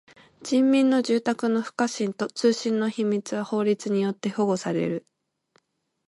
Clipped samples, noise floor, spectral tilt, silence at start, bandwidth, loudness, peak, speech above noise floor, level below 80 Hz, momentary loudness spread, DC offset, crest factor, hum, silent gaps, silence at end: under 0.1%; -72 dBFS; -5.5 dB/octave; 0.4 s; 11.5 kHz; -25 LUFS; -10 dBFS; 49 dB; -74 dBFS; 8 LU; under 0.1%; 16 dB; none; none; 1.1 s